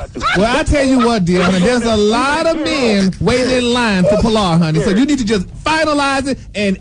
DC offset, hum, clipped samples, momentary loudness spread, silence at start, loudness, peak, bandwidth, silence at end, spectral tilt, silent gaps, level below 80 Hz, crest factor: under 0.1%; none; under 0.1%; 4 LU; 0 s; -14 LUFS; -4 dBFS; 10.5 kHz; 0 s; -5.5 dB/octave; none; -30 dBFS; 10 dB